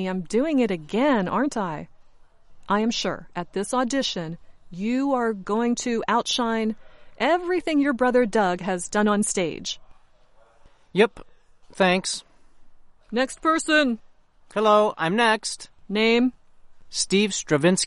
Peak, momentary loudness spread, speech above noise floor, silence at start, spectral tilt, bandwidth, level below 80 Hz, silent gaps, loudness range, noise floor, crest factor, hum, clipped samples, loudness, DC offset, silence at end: -6 dBFS; 12 LU; 31 dB; 0 s; -4 dB/octave; 11.5 kHz; -54 dBFS; none; 5 LU; -54 dBFS; 18 dB; none; under 0.1%; -23 LUFS; under 0.1%; 0 s